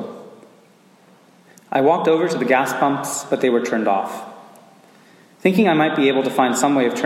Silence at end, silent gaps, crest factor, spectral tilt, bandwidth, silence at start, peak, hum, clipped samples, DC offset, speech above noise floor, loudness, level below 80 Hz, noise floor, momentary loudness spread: 0 s; none; 18 dB; -4.5 dB/octave; 16.5 kHz; 0 s; -2 dBFS; none; under 0.1%; under 0.1%; 34 dB; -18 LUFS; -76 dBFS; -52 dBFS; 10 LU